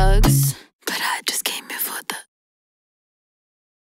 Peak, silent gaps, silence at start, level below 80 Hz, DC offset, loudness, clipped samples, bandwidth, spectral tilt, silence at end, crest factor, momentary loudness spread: -2 dBFS; 0.73-0.79 s; 0 s; -26 dBFS; under 0.1%; -21 LUFS; under 0.1%; 16.5 kHz; -4 dB/octave; 1.65 s; 20 dB; 14 LU